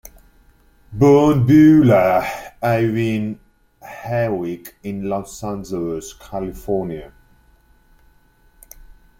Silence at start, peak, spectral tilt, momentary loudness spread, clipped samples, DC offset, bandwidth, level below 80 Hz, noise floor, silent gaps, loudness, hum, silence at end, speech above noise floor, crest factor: 0.9 s; -2 dBFS; -7.5 dB/octave; 19 LU; under 0.1%; under 0.1%; 16 kHz; -44 dBFS; -54 dBFS; none; -17 LUFS; none; 2.15 s; 37 dB; 16 dB